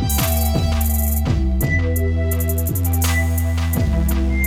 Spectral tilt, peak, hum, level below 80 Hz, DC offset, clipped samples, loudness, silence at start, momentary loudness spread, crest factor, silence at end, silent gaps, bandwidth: -5.5 dB/octave; -6 dBFS; none; -22 dBFS; under 0.1%; under 0.1%; -19 LUFS; 0 s; 2 LU; 12 dB; 0 s; none; 19 kHz